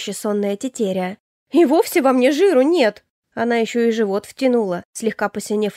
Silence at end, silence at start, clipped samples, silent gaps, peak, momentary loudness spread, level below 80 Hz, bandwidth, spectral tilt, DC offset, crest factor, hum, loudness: 0.05 s; 0 s; under 0.1%; 1.20-1.46 s, 3.10-3.23 s, 4.85-4.93 s; -4 dBFS; 10 LU; -68 dBFS; 16 kHz; -5 dB/octave; under 0.1%; 14 dB; none; -18 LUFS